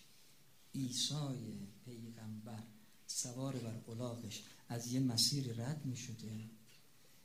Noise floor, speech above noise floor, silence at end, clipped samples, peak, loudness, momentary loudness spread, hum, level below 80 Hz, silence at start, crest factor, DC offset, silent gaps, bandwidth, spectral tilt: -68 dBFS; 26 dB; 0.45 s; under 0.1%; -22 dBFS; -41 LUFS; 18 LU; none; -76 dBFS; 0 s; 22 dB; under 0.1%; none; 15.5 kHz; -4 dB/octave